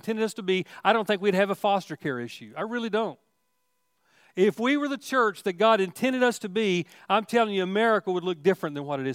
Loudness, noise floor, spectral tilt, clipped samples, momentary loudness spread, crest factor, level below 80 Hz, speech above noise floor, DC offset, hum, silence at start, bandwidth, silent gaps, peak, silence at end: -26 LUFS; -76 dBFS; -5 dB/octave; under 0.1%; 9 LU; 20 dB; -82 dBFS; 50 dB; under 0.1%; none; 0.05 s; 16 kHz; none; -6 dBFS; 0 s